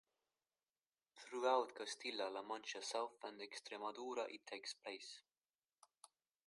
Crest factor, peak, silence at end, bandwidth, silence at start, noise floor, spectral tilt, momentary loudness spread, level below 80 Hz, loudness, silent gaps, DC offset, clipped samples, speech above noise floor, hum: 24 dB; -24 dBFS; 1.25 s; 11.5 kHz; 1.15 s; under -90 dBFS; -1 dB/octave; 14 LU; under -90 dBFS; -46 LUFS; none; under 0.1%; under 0.1%; over 44 dB; none